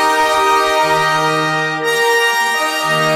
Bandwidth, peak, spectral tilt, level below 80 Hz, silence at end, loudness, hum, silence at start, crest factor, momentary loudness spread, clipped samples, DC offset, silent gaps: 16 kHz; -2 dBFS; -2.5 dB/octave; -52 dBFS; 0 s; -13 LUFS; none; 0 s; 12 dB; 3 LU; under 0.1%; under 0.1%; none